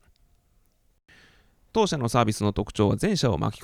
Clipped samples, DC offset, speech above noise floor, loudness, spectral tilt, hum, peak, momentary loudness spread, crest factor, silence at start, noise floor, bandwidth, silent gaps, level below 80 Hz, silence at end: under 0.1%; under 0.1%; 40 dB; -25 LUFS; -6 dB/octave; none; -4 dBFS; 4 LU; 22 dB; 1.75 s; -64 dBFS; 15.5 kHz; none; -46 dBFS; 0 s